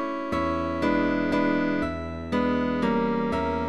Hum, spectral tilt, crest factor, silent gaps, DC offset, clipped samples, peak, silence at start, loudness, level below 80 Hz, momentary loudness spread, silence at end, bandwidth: none; -7.5 dB/octave; 14 dB; none; 0.5%; under 0.1%; -12 dBFS; 0 s; -26 LUFS; -44 dBFS; 5 LU; 0 s; 11 kHz